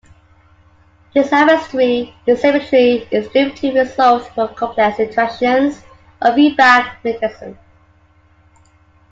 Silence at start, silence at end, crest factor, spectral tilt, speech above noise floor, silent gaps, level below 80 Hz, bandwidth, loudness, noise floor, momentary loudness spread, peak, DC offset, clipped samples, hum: 1.15 s; 1.6 s; 16 dB; -5 dB/octave; 37 dB; none; -52 dBFS; 7.8 kHz; -14 LUFS; -51 dBFS; 10 LU; 0 dBFS; under 0.1%; under 0.1%; none